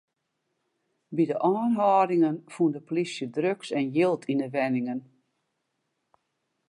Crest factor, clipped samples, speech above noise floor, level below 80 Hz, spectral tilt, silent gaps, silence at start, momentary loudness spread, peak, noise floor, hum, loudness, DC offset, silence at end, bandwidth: 18 dB; under 0.1%; 53 dB; -82 dBFS; -7 dB/octave; none; 1.1 s; 8 LU; -10 dBFS; -79 dBFS; none; -26 LUFS; under 0.1%; 1.65 s; 11 kHz